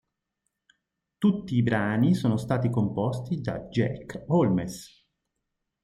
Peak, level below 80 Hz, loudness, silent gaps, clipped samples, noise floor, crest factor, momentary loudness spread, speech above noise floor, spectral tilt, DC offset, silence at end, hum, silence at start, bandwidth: -10 dBFS; -58 dBFS; -26 LUFS; none; under 0.1%; -82 dBFS; 16 dB; 8 LU; 56 dB; -7.5 dB/octave; under 0.1%; 1 s; none; 1.2 s; 13.5 kHz